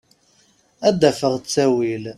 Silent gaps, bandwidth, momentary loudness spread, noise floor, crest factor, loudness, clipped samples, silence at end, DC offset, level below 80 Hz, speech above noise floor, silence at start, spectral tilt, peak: none; 14.5 kHz; 5 LU; -58 dBFS; 20 dB; -19 LUFS; under 0.1%; 0.05 s; under 0.1%; -58 dBFS; 40 dB; 0.8 s; -5 dB/octave; 0 dBFS